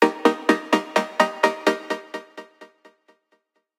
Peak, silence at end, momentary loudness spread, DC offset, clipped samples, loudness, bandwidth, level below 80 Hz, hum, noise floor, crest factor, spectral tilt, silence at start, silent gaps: -2 dBFS; 1.15 s; 17 LU; under 0.1%; under 0.1%; -22 LUFS; 16.5 kHz; -74 dBFS; none; -68 dBFS; 22 dB; -4 dB/octave; 0 s; none